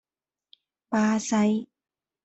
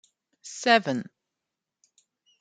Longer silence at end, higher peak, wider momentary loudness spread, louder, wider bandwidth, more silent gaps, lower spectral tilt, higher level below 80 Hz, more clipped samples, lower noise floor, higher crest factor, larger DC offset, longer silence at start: second, 0.6 s vs 1.35 s; second, -14 dBFS vs -4 dBFS; second, 6 LU vs 25 LU; about the same, -25 LUFS vs -24 LUFS; second, 8.2 kHz vs 9.4 kHz; neither; first, -5 dB/octave vs -3.5 dB/octave; first, -68 dBFS vs -82 dBFS; neither; first, under -90 dBFS vs -86 dBFS; second, 14 dB vs 26 dB; neither; first, 0.9 s vs 0.45 s